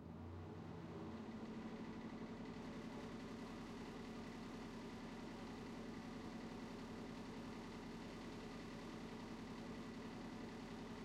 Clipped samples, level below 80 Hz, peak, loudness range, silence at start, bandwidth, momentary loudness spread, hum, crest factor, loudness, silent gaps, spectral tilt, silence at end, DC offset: under 0.1%; -68 dBFS; -40 dBFS; 0 LU; 0 s; 15.5 kHz; 1 LU; none; 12 dB; -52 LUFS; none; -6 dB/octave; 0 s; under 0.1%